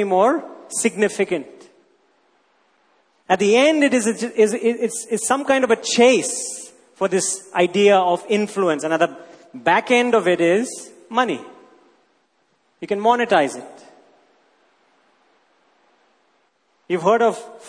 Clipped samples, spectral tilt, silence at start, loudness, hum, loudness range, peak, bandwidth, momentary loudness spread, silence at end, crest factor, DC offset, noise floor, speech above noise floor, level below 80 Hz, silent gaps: under 0.1%; -3.5 dB/octave; 0 s; -19 LUFS; none; 6 LU; -2 dBFS; 11 kHz; 12 LU; 0 s; 18 dB; under 0.1%; -64 dBFS; 46 dB; -70 dBFS; none